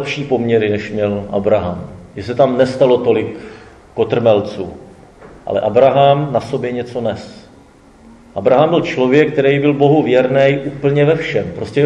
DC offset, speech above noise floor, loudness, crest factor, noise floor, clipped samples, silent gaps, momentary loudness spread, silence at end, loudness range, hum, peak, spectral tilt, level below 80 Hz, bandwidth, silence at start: under 0.1%; 30 dB; -14 LUFS; 14 dB; -44 dBFS; under 0.1%; none; 17 LU; 0 s; 4 LU; none; 0 dBFS; -7.5 dB/octave; -48 dBFS; 9.4 kHz; 0 s